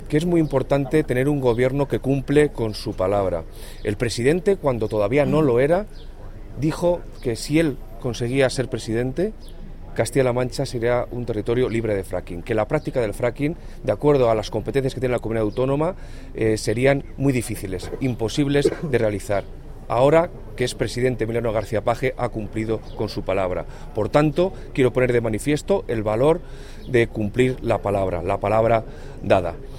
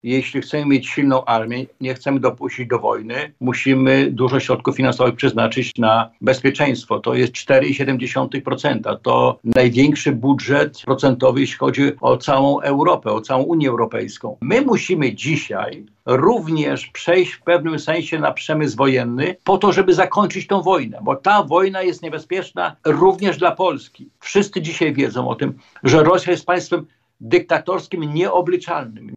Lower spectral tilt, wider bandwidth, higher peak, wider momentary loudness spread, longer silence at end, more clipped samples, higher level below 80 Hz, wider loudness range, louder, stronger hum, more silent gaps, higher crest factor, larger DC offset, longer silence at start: about the same, -6.5 dB/octave vs -6 dB/octave; first, 16.5 kHz vs 8 kHz; about the same, -4 dBFS vs -4 dBFS; about the same, 10 LU vs 8 LU; about the same, 0 s vs 0 s; neither; first, -36 dBFS vs -54 dBFS; about the same, 3 LU vs 2 LU; second, -22 LUFS vs -18 LUFS; neither; neither; about the same, 18 dB vs 14 dB; neither; about the same, 0 s vs 0.05 s